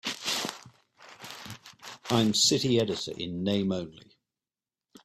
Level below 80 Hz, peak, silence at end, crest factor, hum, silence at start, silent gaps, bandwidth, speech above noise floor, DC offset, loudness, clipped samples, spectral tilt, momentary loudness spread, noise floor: -66 dBFS; -10 dBFS; 1.05 s; 22 dB; none; 0.05 s; none; 15.5 kHz; over 63 dB; under 0.1%; -27 LUFS; under 0.1%; -3.5 dB/octave; 22 LU; under -90 dBFS